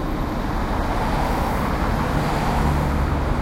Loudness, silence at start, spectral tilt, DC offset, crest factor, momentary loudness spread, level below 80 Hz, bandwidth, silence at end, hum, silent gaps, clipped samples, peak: -22 LUFS; 0 s; -6.5 dB/octave; under 0.1%; 14 dB; 4 LU; -26 dBFS; 16 kHz; 0 s; none; none; under 0.1%; -8 dBFS